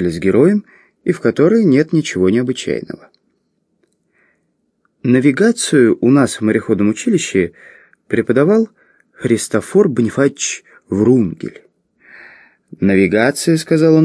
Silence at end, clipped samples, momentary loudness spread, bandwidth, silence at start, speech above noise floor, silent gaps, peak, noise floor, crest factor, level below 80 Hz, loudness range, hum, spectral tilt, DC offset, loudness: 0 s; under 0.1%; 11 LU; 11 kHz; 0 s; 52 dB; none; 0 dBFS; -65 dBFS; 14 dB; -54 dBFS; 4 LU; none; -6 dB/octave; under 0.1%; -14 LUFS